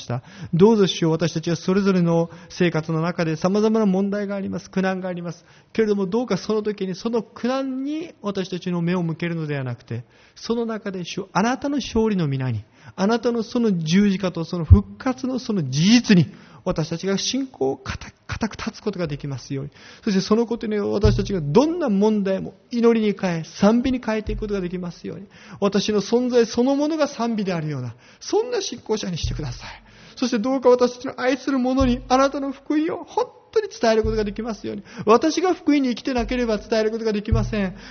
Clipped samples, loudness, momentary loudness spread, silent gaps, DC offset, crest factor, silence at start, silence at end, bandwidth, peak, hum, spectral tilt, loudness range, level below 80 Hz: under 0.1%; -22 LUFS; 12 LU; none; under 0.1%; 22 dB; 0 s; 0 s; 6.6 kHz; 0 dBFS; none; -6 dB/octave; 6 LU; -38 dBFS